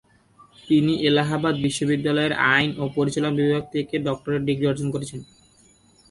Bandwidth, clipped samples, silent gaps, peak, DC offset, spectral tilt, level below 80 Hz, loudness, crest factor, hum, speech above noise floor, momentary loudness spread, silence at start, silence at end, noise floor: 11.5 kHz; under 0.1%; none; -4 dBFS; under 0.1%; -5.5 dB/octave; -56 dBFS; -22 LUFS; 18 dB; none; 34 dB; 8 LU; 0.65 s; 0.85 s; -56 dBFS